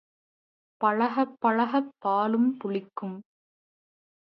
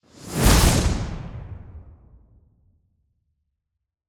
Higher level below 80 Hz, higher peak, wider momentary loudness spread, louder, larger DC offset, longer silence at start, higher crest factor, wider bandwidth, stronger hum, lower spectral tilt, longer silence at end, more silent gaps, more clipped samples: second, -82 dBFS vs -28 dBFS; second, -10 dBFS vs -2 dBFS; second, 13 LU vs 23 LU; second, -27 LUFS vs -20 LUFS; neither; first, 0.8 s vs 0.2 s; about the same, 18 dB vs 22 dB; second, 5.6 kHz vs over 20 kHz; neither; first, -9 dB/octave vs -4.5 dB/octave; second, 1 s vs 2.25 s; neither; neither